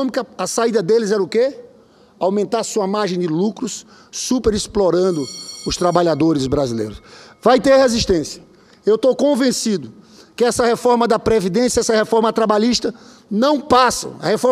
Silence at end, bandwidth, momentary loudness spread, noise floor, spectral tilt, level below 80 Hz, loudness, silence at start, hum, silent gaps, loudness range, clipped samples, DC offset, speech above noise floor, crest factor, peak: 0 s; 15 kHz; 11 LU; -49 dBFS; -4.5 dB/octave; -42 dBFS; -17 LUFS; 0 s; none; none; 3 LU; under 0.1%; under 0.1%; 32 dB; 18 dB; 0 dBFS